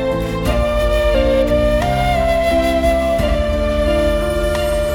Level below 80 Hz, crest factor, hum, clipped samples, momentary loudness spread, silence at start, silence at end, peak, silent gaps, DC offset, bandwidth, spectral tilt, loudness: -22 dBFS; 12 dB; none; under 0.1%; 3 LU; 0 s; 0 s; -4 dBFS; none; under 0.1%; 18.5 kHz; -6 dB/octave; -16 LUFS